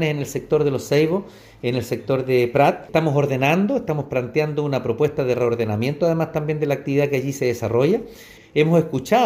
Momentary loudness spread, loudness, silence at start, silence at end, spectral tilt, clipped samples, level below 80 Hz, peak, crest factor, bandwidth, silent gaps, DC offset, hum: 6 LU; -21 LUFS; 0 s; 0 s; -6.5 dB/octave; under 0.1%; -54 dBFS; -4 dBFS; 16 dB; 16 kHz; none; under 0.1%; none